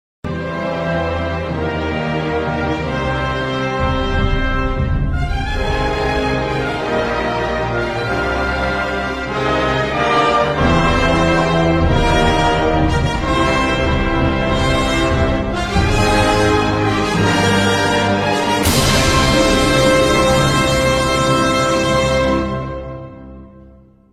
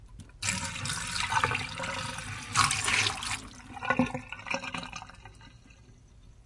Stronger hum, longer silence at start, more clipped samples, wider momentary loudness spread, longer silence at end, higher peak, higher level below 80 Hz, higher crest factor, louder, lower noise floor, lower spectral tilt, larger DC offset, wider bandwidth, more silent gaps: neither; first, 0.25 s vs 0 s; neither; second, 7 LU vs 16 LU; first, 0.5 s vs 0.05 s; first, 0 dBFS vs -8 dBFS; first, -26 dBFS vs -52 dBFS; second, 16 dB vs 26 dB; first, -16 LUFS vs -30 LUFS; second, -44 dBFS vs -55 dBFS; first, -5 dB/octave vs -2.5 dB/octave; neither; first, 16 kHz vs 11.5 kHz; neither